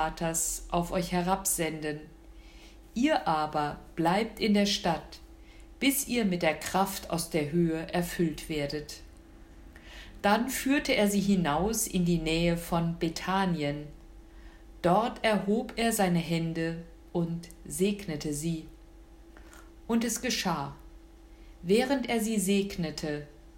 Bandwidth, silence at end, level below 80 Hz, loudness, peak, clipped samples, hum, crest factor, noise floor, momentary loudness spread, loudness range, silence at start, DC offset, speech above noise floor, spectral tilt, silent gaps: 16 kHz; 0 s; -50 dBFS; -29 LUFS; -12 dBFS; under 0.1%; none; 18 dB; -51 dBFS; 11 LU; 6 LU; 0 s; under 0.1%; 23 dB; -4.5 dB/octave; none